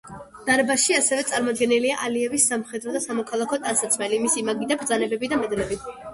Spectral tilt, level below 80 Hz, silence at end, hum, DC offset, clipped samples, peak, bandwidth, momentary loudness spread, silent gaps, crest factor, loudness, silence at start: -2 dB/octave; -56 dBFS; 0 s; none; under 0.1%; under 0.1%; -6 dBFS; 12 kHz; 9 LU; none; 16 dB; -22 LUFS; 0.05 s